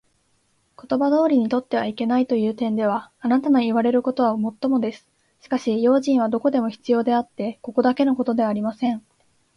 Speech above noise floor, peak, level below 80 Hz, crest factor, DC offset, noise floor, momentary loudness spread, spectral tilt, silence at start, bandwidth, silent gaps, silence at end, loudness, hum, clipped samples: 45 dB; -8 dBFS; -66 dBFS; 14 dB; under 0.1%; -65 dBFS; 7 LU; -7 dB/octave; 0.85 s; 10 kHz; none; 0.6 s; -21 LUFS; none; under 0.1%